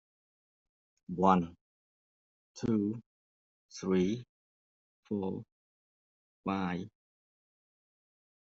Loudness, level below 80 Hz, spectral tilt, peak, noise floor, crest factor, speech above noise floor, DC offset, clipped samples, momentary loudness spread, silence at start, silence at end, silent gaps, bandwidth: -33 LUFS; -70 dBFS; -7 dB/octave; -12 dBFS; under -90 dBFS; 26 dB; over 58 dB; under 0.1%; under 0.1%; 17 LU; 1.1 s; 1.55 s; 1.61-2.55 s, 3.06-3.69 s, 4.29-5.03 s, 5.52-6.44 s; 7.4 kHz